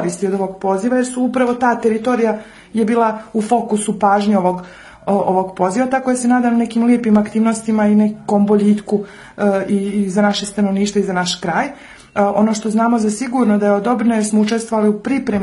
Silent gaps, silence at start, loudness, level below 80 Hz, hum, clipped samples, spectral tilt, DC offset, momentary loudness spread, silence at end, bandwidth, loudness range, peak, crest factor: none; 0 s; -16 LUFS; -52 dBFS; none; under 0.1%; -5.5 dB/octave; under 0.1%; 6 LU; 0 s; 11.5 kHz; 2 LU; -2 dBFS; 14 dB